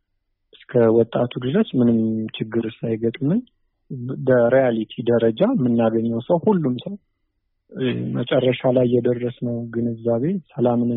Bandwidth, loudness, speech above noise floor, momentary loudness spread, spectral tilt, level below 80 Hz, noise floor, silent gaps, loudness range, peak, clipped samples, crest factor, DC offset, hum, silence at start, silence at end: 4 kHz; -20 LUFS; 52 dB; 9 LU; -7 dB/octave; -60 dBFS; -72 dBFS; none; 3 LU; -6 dBFS; under 0.1%; 16 dB; under 0.1%; none; 0.7 s; 0 s